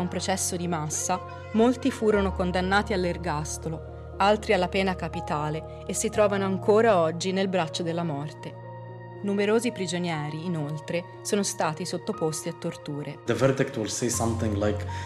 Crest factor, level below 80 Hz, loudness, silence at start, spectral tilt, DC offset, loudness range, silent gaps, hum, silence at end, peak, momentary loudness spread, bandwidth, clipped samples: 18 dB; -50 dBFS; -26 LUFS; 0 s; -4.5 dB/octave; under 0.1%; 5 LU; none; none; 0 s; -10 dBFS; 11 LU; 14.5 kHz; under 0.1%